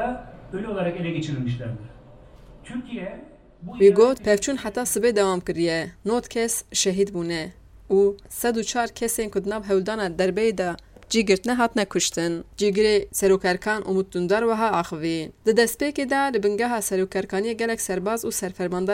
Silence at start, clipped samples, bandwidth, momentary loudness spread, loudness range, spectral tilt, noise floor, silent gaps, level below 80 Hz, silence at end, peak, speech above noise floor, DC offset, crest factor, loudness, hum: 0 s; under 0.1%; 16 kHz; 11 LU; 3 LU; -4 dB/octave; -47 dBFS; none; -50 dBFS; 0 s; -4 dBFS; 24 dB; under 0.1%; 18 dB; -23 LUFS; none